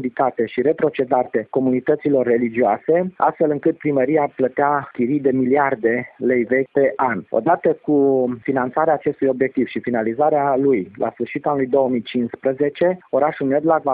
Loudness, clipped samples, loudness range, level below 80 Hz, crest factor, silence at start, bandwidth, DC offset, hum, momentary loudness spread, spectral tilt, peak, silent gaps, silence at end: -19 LUFS; under 0.1%; 1 LU; -62 dBFS; 16 dB; 0 s; 4.8 kHz; under 0.1%; none; 5 LU; -11.5 dB/octave; -2 dBFS; none; 0 s